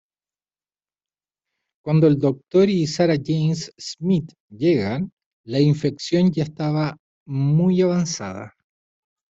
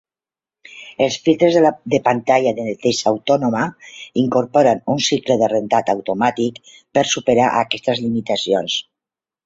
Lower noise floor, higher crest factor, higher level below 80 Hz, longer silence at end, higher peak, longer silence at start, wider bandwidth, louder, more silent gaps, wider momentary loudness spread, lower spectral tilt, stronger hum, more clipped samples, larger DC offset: about the same, under -90 dBFS vs under -90 dBFS; about the same, 16 dB vs 16 dB; about the same, -58 dBFS vs -58 dBFS; first, 0.85 s vs 0.65 s; second, -6 dBFS vs -2 dBFS; first, 1.85 s vs 0.7 s; about the same, 8 kHz vs 7.8 kHz; second, -21 LUFS vs -17 LUFS; first, 4.40-4.48 s, 5.12-5.17 s, 5.26-5.44 s, 6.99-7.26 s vs none; first, 13 LU vs 8 LU; first, -7 dB/octave vs -4.5 dB/octave; first, 50 Hz at -40 dBFS vs none; neither; neither